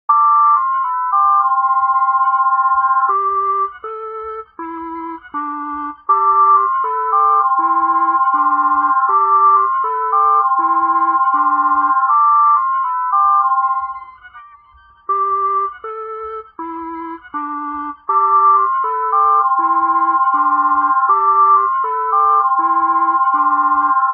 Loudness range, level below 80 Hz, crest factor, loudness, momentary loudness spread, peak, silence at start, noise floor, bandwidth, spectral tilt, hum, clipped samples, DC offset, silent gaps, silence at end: 7 LU; -58 dBFS; 12 dB; -14 LUFS; 15 LU; -2 dBFS; 0.1 s; -47 dBFS; 3.3 kHz; -3 dB/octave; none; under 0.1%; under 0.1%; none; 0 s